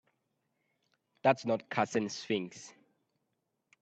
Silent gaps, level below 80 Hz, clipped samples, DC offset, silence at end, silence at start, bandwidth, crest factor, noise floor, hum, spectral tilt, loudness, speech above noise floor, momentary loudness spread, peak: none; -78 dBFS; under 0.1%; under 0.1%; 1.1 s; 1.25 s; 8.8 kHz; 24 dB; -83 dBFS; none; -5 dB/octave; -33 LUFS; 50 dB; 17 LU; -12 dBFS